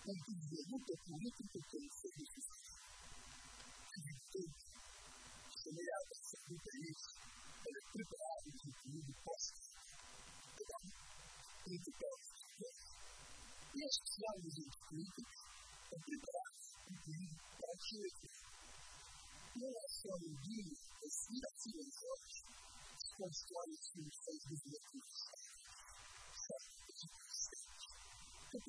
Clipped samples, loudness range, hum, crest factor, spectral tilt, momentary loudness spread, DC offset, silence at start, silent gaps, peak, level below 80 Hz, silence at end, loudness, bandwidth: under 0.1%; 5 LU; none; 28 dB; -3 dB/octave; 10 LU; under 0.1%; 0 s; none; -24 dBFS; -72 dBFS; 0 s; -51 LUFS; 11 kHz